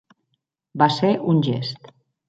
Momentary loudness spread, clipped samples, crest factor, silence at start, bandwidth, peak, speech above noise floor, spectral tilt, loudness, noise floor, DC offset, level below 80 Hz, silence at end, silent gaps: 18 LU; under 0.1%; 20 dB; 0.75 s; 7.8 kHz; -2 dBFS; 55 dB; -7 dB/octave; -20 LUFS; -75 dBFS; under 0.1%; -66 dBFS; 0.5 s; none